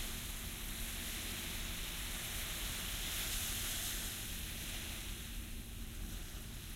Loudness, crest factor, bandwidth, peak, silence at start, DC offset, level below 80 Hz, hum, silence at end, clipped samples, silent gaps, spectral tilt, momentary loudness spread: -41 LUFS; 16 dB; 16 kHz; -26 dBFS; 0 s; under 0.1%; -48 dBFS; none; 0 s; under 0.1%; none; -2 dB/octave; 9 LU